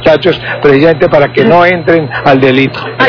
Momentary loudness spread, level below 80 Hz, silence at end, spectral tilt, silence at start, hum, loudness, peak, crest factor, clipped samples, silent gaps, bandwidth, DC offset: 4 LU; -38 dBFS; 0 s; -7.5 dB/octave; 0 s; none; -7 LUFS; 0 dBFS; 8 dB; 7%; none; 5.4 kHz; under 0.1%